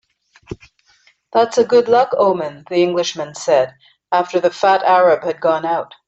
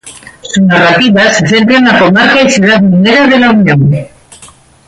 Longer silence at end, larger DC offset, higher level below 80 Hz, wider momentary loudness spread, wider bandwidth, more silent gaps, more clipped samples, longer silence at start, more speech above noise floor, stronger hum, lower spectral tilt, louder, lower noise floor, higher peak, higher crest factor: second, 0.2 s vs 0.4 s; neither; second, -58 dBFS vs -42 dBFS; first, 11 LU vs 5 LU; second, 8.2 kHz vs 11.5 kHz; neither; neither; first, 0.5 s vs 0.05 s; first, 40 dB vs 31 dB; neither; about the same, -4.5 dB/octave vs -5 dB/octave; second, -16 LUFS vs -6 LUFS; first, -56 dBFS vs -37 dBFS; about the same, -2 dBFS vs 0 dBFS; first, 16 dB vs 8 dB